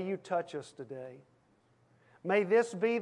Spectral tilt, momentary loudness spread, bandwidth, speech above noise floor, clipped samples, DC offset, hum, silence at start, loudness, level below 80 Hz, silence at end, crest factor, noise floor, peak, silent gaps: -5.5 dB/octave; 18 LU; 11 kHz; 36 dB; under 0.1%; under 0.1%; none; 0 s; -32 LUFS; -86 dBFS; 0 s; 18 dB; -69 dBFS; -16 dBFS; none